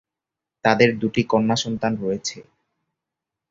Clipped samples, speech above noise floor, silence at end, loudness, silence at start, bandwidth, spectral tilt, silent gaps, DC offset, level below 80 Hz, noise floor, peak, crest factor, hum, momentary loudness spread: under 0.1%; 66 dB; 1.1 s; -21 LUFS; 0.65 s; 7.8 kHz; -5 dB/octave; none; under 0.1%; -58 dBFS; -87 dBFS; -2 dBFS; 22 dB; none; 9 LU